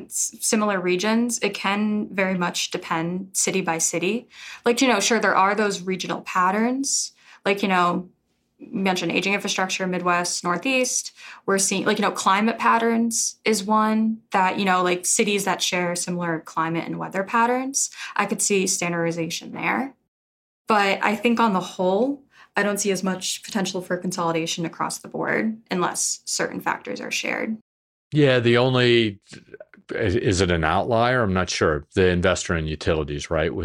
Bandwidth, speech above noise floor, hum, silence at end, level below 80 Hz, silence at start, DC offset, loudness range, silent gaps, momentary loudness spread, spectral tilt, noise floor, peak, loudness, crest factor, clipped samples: 16.5 kHz; over 68 dB; none; 0 s; -52 dBFS; 0 s; under 0.1%; 4 LU; 20.08-20.65 s, 27.61-28.11 s; 8 LU; -3.5 dB/octave; under -90 dBFS; -4 dBFS; -22 LUFS; 20 dB; under 0.1%